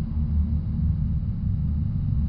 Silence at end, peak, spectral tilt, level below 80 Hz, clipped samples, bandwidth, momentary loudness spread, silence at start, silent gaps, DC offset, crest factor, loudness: 0 s; -12 dBFS; -13 dB/octave; -28 dBFS; under 0.1%; 2.2 kHz; 2 LU; 0 s; none; under 0.1%; 12 dB; -26 LUFS